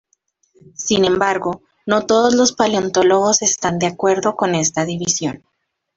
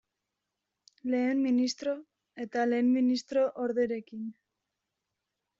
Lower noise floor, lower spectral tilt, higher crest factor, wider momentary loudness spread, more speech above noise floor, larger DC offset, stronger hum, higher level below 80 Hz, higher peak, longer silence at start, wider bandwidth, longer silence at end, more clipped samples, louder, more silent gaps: second, -65 dBFS vs -86 dBFS; about the same, -3.5 dB/octave vs -3.5 dB/octave; about the same, 16 dB vs 14 dB; second, 9 LU vs 15 LU; second, 48 dB vs 57 dB; neither; neither; first, -54 dBFS vs -76 dBFS; first, -2 dBFS vs -18 dBFS; second, 0.8 s vs 1.05 s; about the same, 8 kHz vs 7.6 kHz; second, 0.6 s vs 1.25 s; neither; first, -16 LUFS vs -29 LUFS; neither